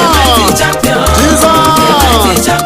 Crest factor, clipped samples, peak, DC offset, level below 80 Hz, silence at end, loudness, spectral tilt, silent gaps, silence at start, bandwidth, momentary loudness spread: 8 dB; 0.1%; 0 dBFS; under 0.1%; -18 dBFS; 0 s; -7 LUFS; -3.5 dB/octave; none; 0 s; 16.5 kHz; 3 LU